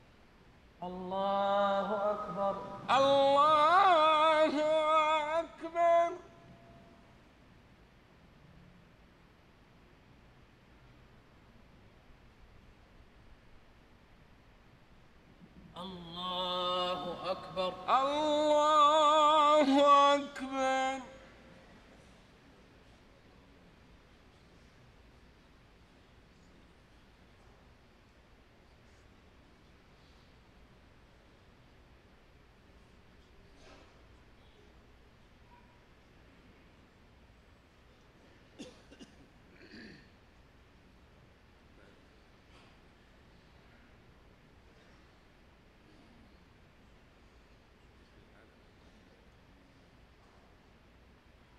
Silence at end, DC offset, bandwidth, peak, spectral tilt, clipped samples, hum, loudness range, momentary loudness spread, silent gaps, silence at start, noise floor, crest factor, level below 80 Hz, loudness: 11.65 s; under 0.1%; 10.5 kHz; -14 dBFS; -4 dB/octave; under 0.1%; none; 14 LU; 24 LU; none; 0.8 s; -62 dBFS; 22 dB; -64 dBFS; -29 LUFS